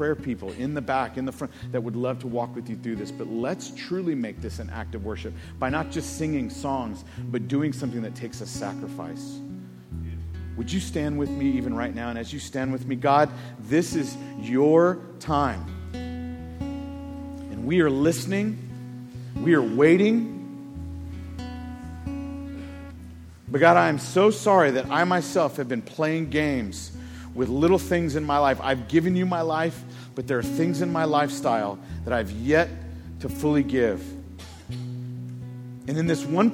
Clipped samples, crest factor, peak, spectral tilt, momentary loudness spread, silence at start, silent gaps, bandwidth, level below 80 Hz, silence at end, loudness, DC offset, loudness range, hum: under 0.1%; 22 dB; -2 dBFS; -6 dB/octave; 17 LU; 0 s; none; 17 kHz; -46 dBFS; 0 s; -25 LUFS; under 0.1%; 8 LU; none